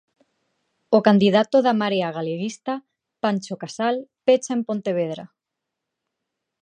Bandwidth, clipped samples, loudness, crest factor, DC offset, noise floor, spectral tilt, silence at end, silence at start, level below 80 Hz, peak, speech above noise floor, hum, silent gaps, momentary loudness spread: 9.6 kHz; under 0.1%; -21 LUFS; 20 dB; under 0.1%; -83 dBFS; -6 dB/octave; 1.35 s; 0.9 s; -72 dBFS; -2 dBFS; 63 dB; none; none; 13 LU